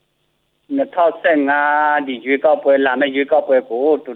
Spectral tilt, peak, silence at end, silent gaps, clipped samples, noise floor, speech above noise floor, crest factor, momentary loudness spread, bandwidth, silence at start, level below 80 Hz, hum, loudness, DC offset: -7 dB/octave; -2 dBFS; 0 s; none; under 0.1%; -66 dBFS; 50 dB; 14 dB; 5 LU; 4.2 kHz; 0.7 s; -72 dBFS; none; -16 LUFS; under 0.1%